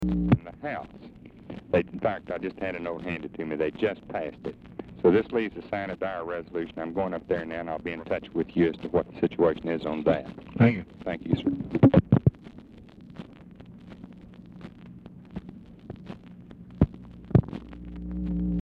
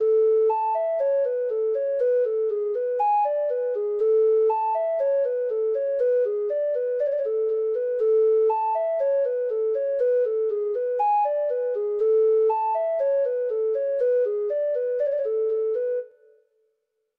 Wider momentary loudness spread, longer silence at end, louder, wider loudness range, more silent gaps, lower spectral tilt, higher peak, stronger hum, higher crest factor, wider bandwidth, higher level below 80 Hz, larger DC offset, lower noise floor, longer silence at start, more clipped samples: first, 24 LU vs 5 LU; second, 0 s vs 1.1 s; second, -27 LUFS vs -23 LUFS; first, 14 LU vs 1 LU; neither; first, -10 dB/octave vs -5.5 dB/octave; first, -6 dBFS vs -14 dBFS; neither; first, 22 dB vs 8 dB; first, 5.6 kHz vs 3 kHz; first, -46 dBFS vs -76 dBFS; neither; second, -48 dBFS vs -75 dBFS; about the same, 0 s vs 0 s; neither